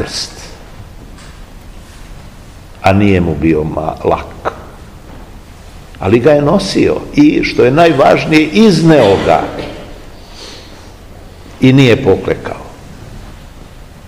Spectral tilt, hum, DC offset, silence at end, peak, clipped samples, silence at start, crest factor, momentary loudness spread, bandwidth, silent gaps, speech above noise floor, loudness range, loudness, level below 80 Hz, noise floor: -6.5 dB/octave; none; 0.4%; 0.25 s; 0 dBFS; 1%; 0 s; 12 dB; 24 LU; 15.5 kHz; none; 24 dB; 7 LU; -10 LUFS; -34 dBFS; -33 dBFS